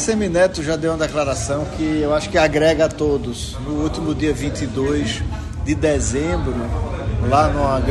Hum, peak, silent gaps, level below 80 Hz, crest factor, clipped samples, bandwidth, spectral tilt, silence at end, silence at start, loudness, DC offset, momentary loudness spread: none; -4 dBFS; none; -30 dBFS; 16 dB; under 0.1%; 12.5 kHz; -5.5 dB/octave; 0 s; 0 s; -19 LUFS; under 0.1%; 8 LU